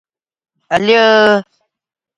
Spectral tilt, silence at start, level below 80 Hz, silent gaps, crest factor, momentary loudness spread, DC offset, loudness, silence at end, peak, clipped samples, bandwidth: -4.5 dB/octave; 0.7 s; -56 dBFS; none; 14 dB; 9 LU; under 0.1%; -11 LUFS; 0.75 s; 0 dBFS; under 0.1%; 10.5 kHz